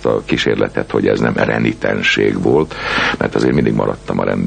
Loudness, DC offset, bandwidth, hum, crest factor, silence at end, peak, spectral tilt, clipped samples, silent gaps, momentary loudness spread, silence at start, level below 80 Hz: -15 LUFS; under 0.1%; 9.6 kHz; none; 14 dB; 0 s; -2 dBFS; -6 dB/octave; under 0.1%; none; 4 LU; 0 s; -38 dBFS